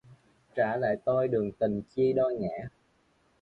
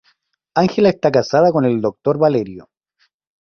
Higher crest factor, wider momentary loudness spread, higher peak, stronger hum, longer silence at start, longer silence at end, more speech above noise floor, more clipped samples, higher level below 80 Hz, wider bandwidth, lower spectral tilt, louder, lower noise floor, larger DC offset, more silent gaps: about the same, 16 dB vs 16 dB; first, 11 LU vs 8 LU; second, -14 dBFS vs -2 dBFS; neither; second, 0.1 s vs 0.55 s; about the same, 0.75 s vs 0.8 s; second, 40 dB vs 49 dB; neither; second, -62 dBFS vs -56 dBFS; second, 5.6 kHz vs 6.8 kHz; first, -9 dB/octave vs -7 dB/octave; second, -29 LUFS vs -16 LUFS; first, -68 dBFS vs -64 dBFS; neither; neither